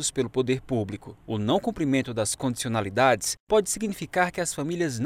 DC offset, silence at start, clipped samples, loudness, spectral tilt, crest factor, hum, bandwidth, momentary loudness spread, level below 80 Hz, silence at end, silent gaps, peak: under 0.1%; 0 s; under 0.1%; -26 LUFS; -4.5 dB/octave; 20 dB; none; 16 kHz; 7 LU; -54 dBFS; 0 s; 3.40-3.47 s; -6 dBFS